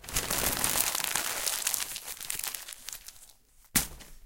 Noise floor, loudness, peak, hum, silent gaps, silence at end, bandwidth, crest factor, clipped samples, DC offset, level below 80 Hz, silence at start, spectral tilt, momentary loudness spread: -58 dBFS; -30 LUFS; -2 dBFS; none; none; 0 s; 17.5 kHz; 30 dB; under 0.1%; under 0.1%; -50 dBFS; 0 s; -0.5 dB/octave; 14 LU